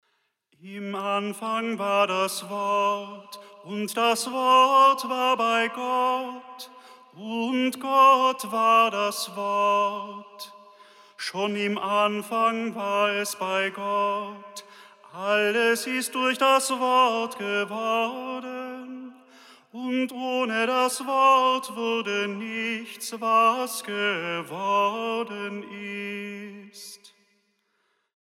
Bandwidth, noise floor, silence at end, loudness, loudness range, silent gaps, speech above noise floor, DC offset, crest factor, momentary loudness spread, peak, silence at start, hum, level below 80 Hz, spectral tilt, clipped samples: 16 kHz; -72 dBFS; 1.3 s; -24 LUFS; 6 LU; none; 48 dB; under 0.1%; 18 dB; 20 LU; -8 dBFS; 0.65 s; none; under -90 dBFS; -3 dB/octave; under 0.1%